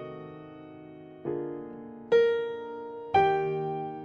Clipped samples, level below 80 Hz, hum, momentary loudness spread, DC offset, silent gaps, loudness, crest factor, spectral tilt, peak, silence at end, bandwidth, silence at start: under 0.1%; -66 dBFS; none; 22 LU; under 0.1%; none; -29 LUFS; 18 dB; -7 dB/octave; -12 dBFS; 0 s; 6.6 kHz; 0 s